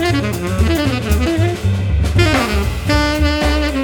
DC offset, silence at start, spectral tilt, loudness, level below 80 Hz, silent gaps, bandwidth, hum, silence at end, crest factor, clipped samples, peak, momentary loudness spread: under 0.1%; 0 s; -5.5 dB/octave; -16 LUFS; -20 dBFS; none; 19 kHz; none; 0 s; 14 dB; under 0.1%; 0 dBFS; 4 LU